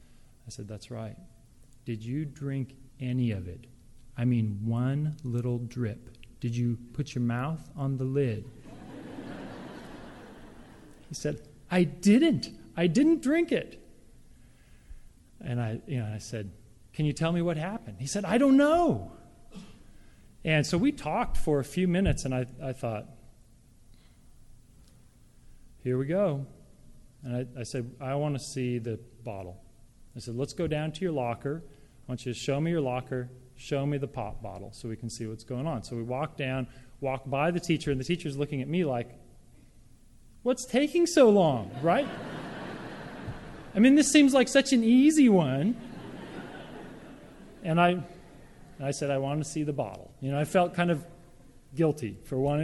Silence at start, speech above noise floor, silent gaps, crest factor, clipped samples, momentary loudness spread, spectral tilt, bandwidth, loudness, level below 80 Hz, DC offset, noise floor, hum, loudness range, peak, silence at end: 0.45 s; 29 dB; none; 24 dB; under 0.1%; 21 LU; -6 dB/octave; 12.5 kHz; -28 LUFS; -50 dBFS; under 0.1%; -56 dBFS; none; 10 LU; -6 dBFS; 0 s